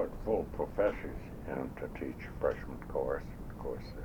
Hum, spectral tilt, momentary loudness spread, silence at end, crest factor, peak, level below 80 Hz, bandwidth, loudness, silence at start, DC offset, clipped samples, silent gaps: none; -8 dB/octave; 10 LU; 0 s; 18 dB; -18 dBFS; -46 dBFS; over 20 kHz; -37 LUFS; 0 s; under 0.1%; under 0.1%; none